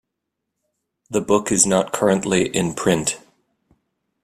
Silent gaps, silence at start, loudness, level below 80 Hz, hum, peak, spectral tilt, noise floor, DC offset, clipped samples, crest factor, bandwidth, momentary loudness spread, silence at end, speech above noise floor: none; 1.1 s; -19 LUFS; -54 dBFS; none; 0 dBFS; -4 dB/octave; -80 dBFS; under 0.1%; under 0.1%; 22 dB; 15 kHz; 9 LU; 1.05 s; 61 dB